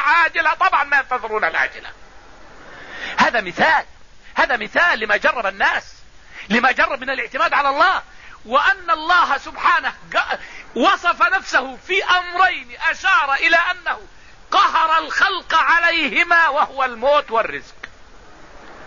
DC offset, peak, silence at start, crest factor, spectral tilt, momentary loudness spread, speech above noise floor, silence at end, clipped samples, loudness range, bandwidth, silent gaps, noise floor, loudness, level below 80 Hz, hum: 0.6%; -2 dBFS; 0 s; 16 dB; -2.5 dB/octave; 10 LU; 26 dB; 0 s; under 0.1%; 3 LU; 7.4 kHz; none; -44 dBFS; -17 LUFS; -48 dBFS; none